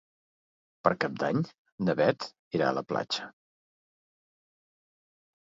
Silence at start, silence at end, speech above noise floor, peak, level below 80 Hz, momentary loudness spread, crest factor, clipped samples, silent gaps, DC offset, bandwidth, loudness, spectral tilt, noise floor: 0.85 s; 2.25 s; over 61 dB; -6 dBFS; -70 dBFS; 8 LU; 26 dB; under 0.1%; 1.58-1.65 s, 1.72-1.78 s, 2.39-2.51 s; under 0.1%; 7.8 kHz; -30 LUFS; -6 dB/octave; under -90 dBFS